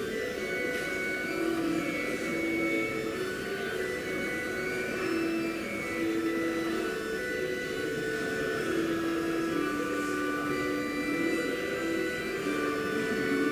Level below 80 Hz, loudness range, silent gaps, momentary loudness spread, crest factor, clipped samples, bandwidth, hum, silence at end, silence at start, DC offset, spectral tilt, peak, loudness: -58 dBFS; 1 LU; none; 3 LU; 14 dB; under 0.1%; 16 kHz; none; 0 s; 0 s; under 0.1%; -4.5 dB/octave; -18 dBFS; -31 LUFS